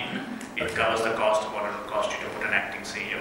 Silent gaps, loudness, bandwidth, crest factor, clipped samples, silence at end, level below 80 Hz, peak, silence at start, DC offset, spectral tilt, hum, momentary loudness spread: none; -27 LUFS; 16.5 kHz; 20 dB; under 0.1%; 0 s; -58 dBFS; -8 dBFS; 0 s; under 0.1%; -3.5 dB/octave; none; 8 LU